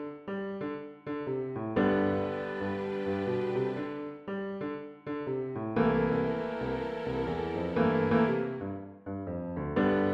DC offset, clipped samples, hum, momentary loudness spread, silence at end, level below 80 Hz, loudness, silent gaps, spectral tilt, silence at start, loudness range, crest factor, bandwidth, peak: under 0.1%; under 0.1%; none; 11 LU; 0 s; -56 dBFS; -32 LUFS; none; -9 dB/octave; 0 s; 4 LU; 18 dB; 7.4 kHz; -14 dBFS